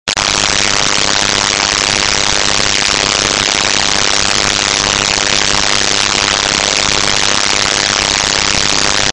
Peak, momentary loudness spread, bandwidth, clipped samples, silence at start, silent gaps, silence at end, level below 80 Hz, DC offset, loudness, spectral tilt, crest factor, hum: 0 dBFS; 0 LU; 16 kHz; under 0.1%; 0.05 s; none; 0 s; -34 dBFS; under 0.1%; -10 LUFS; -0.5 dB/octave; 12 dB; none